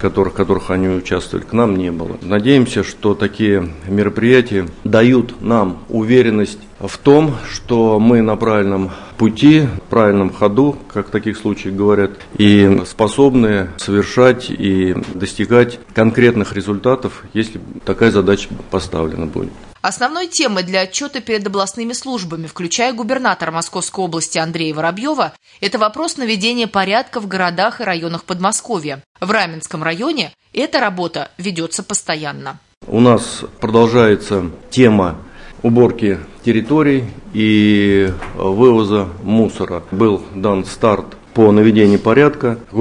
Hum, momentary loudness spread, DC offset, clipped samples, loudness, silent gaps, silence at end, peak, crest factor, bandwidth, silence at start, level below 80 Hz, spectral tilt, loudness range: none; 11 LU; under 0.1%; under 0.1%; -15 LUFS; 29.06-29.15 s, 32.77-32.81 s; 0 s; 0 dBFS; 14 dB; 11 kHz; 0 s; -42 dBFS; -5.5 dB/octave; 5 LU